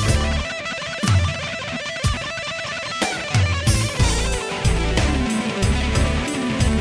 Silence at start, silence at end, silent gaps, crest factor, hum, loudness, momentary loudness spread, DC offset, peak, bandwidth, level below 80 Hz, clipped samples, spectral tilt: 0 s; 0 s; none; 16 dB; none; -21 LUFS; 6 LU; under 0.1%; -4 dBFS; 11 kHz; -26 dBFS; under 0.1%; -4.5 dB/octave